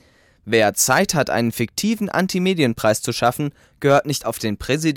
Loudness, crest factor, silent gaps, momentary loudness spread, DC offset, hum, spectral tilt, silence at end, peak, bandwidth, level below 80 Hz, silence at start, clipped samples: -19 LUFS; 16 dB; none; 8 LU; under 0.1%; none; -4 dB/octave; 0 s; -2 dBFS; 18 kHz; -50 dBFS; 0.45 s; under 0.1%